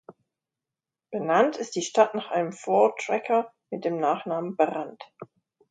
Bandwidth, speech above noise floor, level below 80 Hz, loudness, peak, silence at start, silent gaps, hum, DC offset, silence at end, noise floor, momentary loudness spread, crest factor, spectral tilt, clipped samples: 9.4 kHz; 64 dB; -80 dBFS; -25 LUFS; -4 dBFS; 0.1 s; none; none; under 0.1%; 0.45 s; -89 dBFS; 14 LU; 22 dB; -4.5 dB/octave; under 0.1%